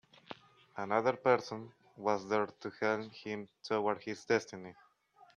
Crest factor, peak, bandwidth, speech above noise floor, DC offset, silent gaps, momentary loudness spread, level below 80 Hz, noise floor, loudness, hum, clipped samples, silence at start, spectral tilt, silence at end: 24 dB; -14 dBFS; 9.6 kHz; 30 dB; under 0.1%; none; 21 LU; -80 dBFS; -65 dBFS; -35 LUFS; none; under 0.1%; 0.3 s; -5 dB/octave; 0.1 s